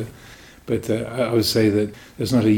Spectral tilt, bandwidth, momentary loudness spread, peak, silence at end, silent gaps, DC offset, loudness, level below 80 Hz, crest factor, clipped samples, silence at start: -6 dB/octave; 19 kHz; 12 LU; -8 dBFS; 0 s; none; under 0.1%; -21 LUFS; -50 dBFS; 14 dB; under 0.1%; 0 s